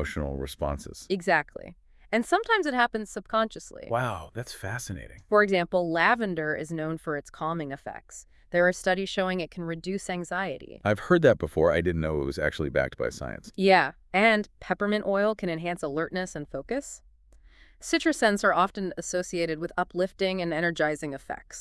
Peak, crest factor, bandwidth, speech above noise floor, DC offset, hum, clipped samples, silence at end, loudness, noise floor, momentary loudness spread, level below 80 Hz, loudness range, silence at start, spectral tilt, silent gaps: -8 dBFS; 20 dB; 12 kHz; 28 dB; under 0.1%; none; under 0.1%; 0 s; -27 LUFS; -55 dBFS; 14 LU; -50 dBFS; 4 LU; 0 s; -5 dB/octave; none